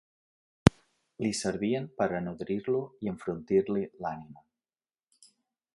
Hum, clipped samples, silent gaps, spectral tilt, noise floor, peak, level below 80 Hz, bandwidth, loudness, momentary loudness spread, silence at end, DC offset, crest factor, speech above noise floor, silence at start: none; under 0.1%; none; -6 dB/octave; under -90 dBFS; 0 dBFS; -50 dBFS; 11.5 kHz; -31 LUFS; 11 LU; 1.35 s; under 0.1%; 32 dB; over 59 dB; 0.65 s